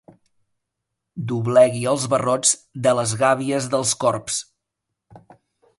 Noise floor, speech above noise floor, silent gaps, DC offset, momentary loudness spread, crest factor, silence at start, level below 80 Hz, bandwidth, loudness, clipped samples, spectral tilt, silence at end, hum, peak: -81 dBFS; 61 dB; none; under 0.1%; 11 LU; 18 dB; 1.15 s; -60 dBFS; 11.5 kHz; -20 LUFS; under 0.1%; -4 dB/octave; 0.6 s; none; -4 dBFS